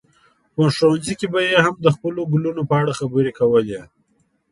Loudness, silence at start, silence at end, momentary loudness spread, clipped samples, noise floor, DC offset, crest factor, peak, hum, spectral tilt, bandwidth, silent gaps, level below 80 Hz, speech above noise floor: -19 LUFS; 0.6 s; 0.65 s; 7 LU; under 0.1%; -64 dBFS; under 0.1%; 18 dB; 0 dBFS; none; -6 dB/octave; 11.5 kHz; none; -56 dBFS; 46 dB